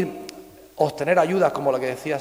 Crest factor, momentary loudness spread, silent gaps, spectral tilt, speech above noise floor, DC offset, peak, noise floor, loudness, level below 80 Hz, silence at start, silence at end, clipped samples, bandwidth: 18 dB; 13 LU; none; -6 dB/octave; 21 dB; under 0.1%; -4 dBFS; -42 dBFS; -22 LUFS; -62 dBFS; 0 s; 0 s; under 0.1%; 16 kHz